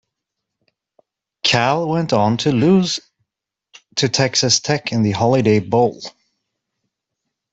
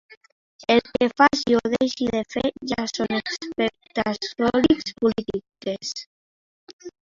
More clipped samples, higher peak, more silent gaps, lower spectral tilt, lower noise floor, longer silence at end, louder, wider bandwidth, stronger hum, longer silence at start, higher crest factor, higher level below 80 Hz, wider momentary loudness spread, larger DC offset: neither; about the same, -2 dBFS vs -2 dBFS; second, none vs 0.17-0.21 s, 0.32-0.59 s, 6.06-6.67 s, 6.73-6.79 s; about the same, -4.5 dB/octave vs -4 dB/octave; second, -83 dBFS vs under -90 dBFS; first, 1.45 s vs 0.15 s; first, -17 LUFS vs -23 LUFS; about the same, 8.2 kHz vs 7.6 kHz; neither; first, 1.45 s vs 0.1 s; second, 16 dB vs 22 dB; about the same, -56 dBFS vs -54 dBFS; second, 7 LU vs 13 LU; neither